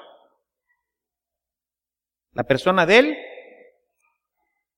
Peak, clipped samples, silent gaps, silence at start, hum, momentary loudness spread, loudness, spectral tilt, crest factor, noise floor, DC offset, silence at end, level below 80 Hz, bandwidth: -2 dBFS; under 0.1%; none; 2.35 s; none; 19 LU; -18 LUFS; -5 dB/octave; 24 dB; under -90 dBFS; under 0.1%; 1.4 s; -62 dBFS; 12.5 kHz